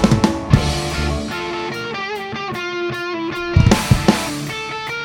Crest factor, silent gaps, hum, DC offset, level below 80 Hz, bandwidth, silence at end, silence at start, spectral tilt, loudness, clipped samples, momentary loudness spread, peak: 18 dB; none; none; under 0.1%; -30 dBFS; 18.5 kHz; 0 s; 0 s; -5.5 dB/octave; -19 LUFS; under 0.1%; 10 LU; 0 dBFS